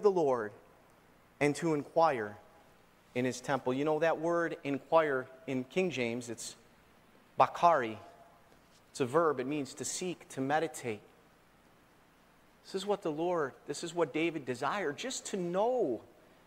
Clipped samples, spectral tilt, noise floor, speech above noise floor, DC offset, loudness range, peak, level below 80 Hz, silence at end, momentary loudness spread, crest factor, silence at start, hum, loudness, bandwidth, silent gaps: under 0.1%; -4.5 dB/octave; -64 dBFS; 31 dB; under 0.1%; 6 LU; -12 dBFS; -74 dBFS; 0.4 s; 12 LU; 22 dB; 0 s; none; -33 LUFS; 16 kHz; none